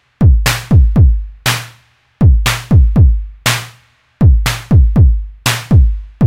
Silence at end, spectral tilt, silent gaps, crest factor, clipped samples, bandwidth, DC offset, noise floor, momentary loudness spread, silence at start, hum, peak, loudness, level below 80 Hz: 0 s; -5 dB/octave; none; 10 dB; 0.2%; 16.5 kHz; 1%; -48 dBFS; 7 LU; 0.2 s; none; 0 dBFS; -12 LUFS; -14 dBFS